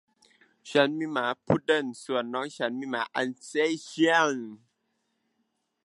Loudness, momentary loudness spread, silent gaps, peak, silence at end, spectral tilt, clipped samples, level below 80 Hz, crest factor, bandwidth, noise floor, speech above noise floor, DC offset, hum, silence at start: -27 LUFS; 8 LU; none; -6 dBFS; 1.3 s; -4.5 dB/octave; under 0.1%; -66 dBFS; 24 dB; 11.5 kHz; -77 dBFS; 49 dB; under 0.1%; none; 0.65 s